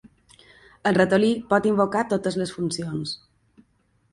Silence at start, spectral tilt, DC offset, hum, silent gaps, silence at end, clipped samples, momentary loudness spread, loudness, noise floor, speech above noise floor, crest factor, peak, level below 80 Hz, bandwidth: 0.85 s; -5.5 dB/octave; under 0.1%; none; none; 0.95 s; under 0.1%; 11 LU; -23 LUFS; -65 dBFS; 43 dB; 20 dB; -4 dBFS; -60 dBFS; 11.5 kHz